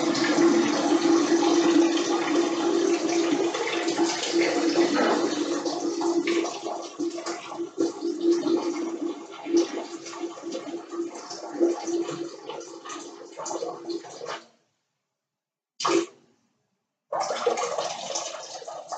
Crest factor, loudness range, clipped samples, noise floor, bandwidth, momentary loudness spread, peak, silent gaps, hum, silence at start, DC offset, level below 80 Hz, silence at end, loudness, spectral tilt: 16 dB; 10 LU; under 0.1%; -89 dBFS; 9 kHz; 16 LU; -10 dBFS; none; none; 0 s; under 0.1%; -84 dBFS; 0 s; -26 LUFS; -3 dB/octave